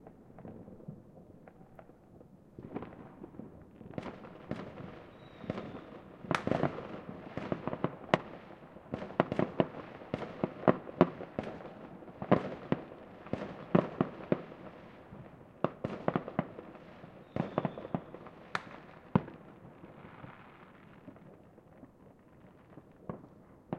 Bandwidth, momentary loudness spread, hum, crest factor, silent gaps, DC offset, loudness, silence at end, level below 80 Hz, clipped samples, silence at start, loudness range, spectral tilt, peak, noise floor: 10.5 kHz; 24 LU; none; 34 dB; none; under 0.1%; -36 LUFS; 0 s; -66 dBFS; under 0.1%; 0 s; 16 LU; -8 dB/octave; -4 dBFS; -59 dBFS